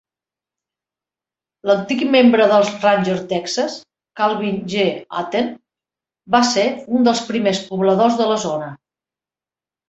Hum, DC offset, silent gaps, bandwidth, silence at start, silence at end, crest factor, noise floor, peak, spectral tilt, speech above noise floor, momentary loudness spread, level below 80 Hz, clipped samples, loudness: none; under 0.1%; none; 8.2 kHz; 1.65 s; 1.15 s; 18 dB; under -90 dBFS; -2 dBFS; -4.5 dB/octave; over 73 dB; 11 LU; -62 dBFS; under 0.1%; -17 LUFS